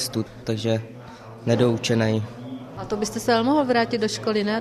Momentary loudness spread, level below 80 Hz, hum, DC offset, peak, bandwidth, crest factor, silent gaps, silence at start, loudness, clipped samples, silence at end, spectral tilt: 16 LU; -56 dBFS; none; under 0.1%; -6 dBFS; 14.5 kHz; 16 dB; none; 0 s; -23 LUFS; under 0.1%; 0 s; -5.5 dB/octave